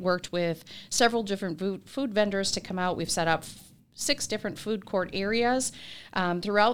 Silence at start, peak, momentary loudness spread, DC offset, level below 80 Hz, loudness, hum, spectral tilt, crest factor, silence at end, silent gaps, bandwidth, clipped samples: 0 s; -8 dBFS; 8 LU; 0.4%; -58 dBFS; -28 LUFS; none; -3.5 dB/octave; 20 dB; 0 s; none; 19 kHz; under 0.1%